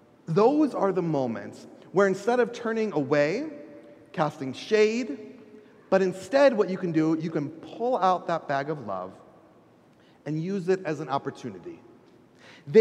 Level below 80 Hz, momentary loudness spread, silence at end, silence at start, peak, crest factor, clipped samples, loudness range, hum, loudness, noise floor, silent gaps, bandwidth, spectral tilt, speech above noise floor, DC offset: -76 dBFS; 18 LU; 0 s; 0.3 s; -6 dBFS; 20 dB; under 0.1%; 7 LU; none; -26 LUFS; -57 dBFS; none; 11 kHz; -6.5 dB/octave; 32 dB; under 0.1%